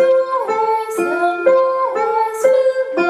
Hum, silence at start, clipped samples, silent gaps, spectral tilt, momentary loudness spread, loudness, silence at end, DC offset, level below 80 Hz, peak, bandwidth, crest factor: none; 0 s; under 0.1%; none; -4 dB/octave; 4 LU; -16 LUFS; 0 s; under 0.1%; -72 dBFS; -2 dBFS; 13.5 kHz; 12 dB